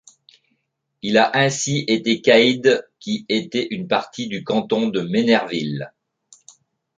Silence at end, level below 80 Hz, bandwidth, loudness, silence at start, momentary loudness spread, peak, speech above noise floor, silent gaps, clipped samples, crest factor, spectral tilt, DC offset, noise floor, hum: 1.1 s; -64 dBFS; 9.4 kHz; -19 LUFS; 1.05 s; 13 LU; -2 dBFS; 53 dB; none; under 0.1%; 18 dB; -4.5 dB/octave; under 0.1%; -72 dBFS; none